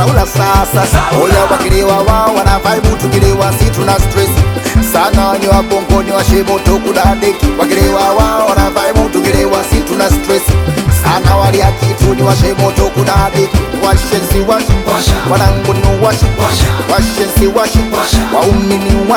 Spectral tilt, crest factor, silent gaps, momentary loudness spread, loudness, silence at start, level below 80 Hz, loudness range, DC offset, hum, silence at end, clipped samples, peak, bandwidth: -5.5 dB/octave; 10 dB; none; 2 LU; -10 LUFS; 0 s; -16 dBFS; 1 LU; under 0.1%; none; 0 s; 1%; 0 dBFS; over 20 kHz